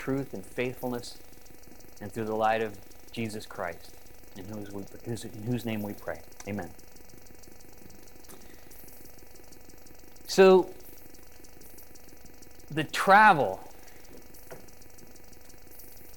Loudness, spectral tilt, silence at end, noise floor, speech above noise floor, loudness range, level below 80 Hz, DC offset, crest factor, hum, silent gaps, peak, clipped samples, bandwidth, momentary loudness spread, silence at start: -27 LUFS; -5 dB/octave; 0.35 s; -52 dBFS; 25 dB; 13 LU; -58 dBFS; 0.6%; 24 dB; none; none; -8 dBFS; under 0.1%; 18 kHz; 29 LU; 0 s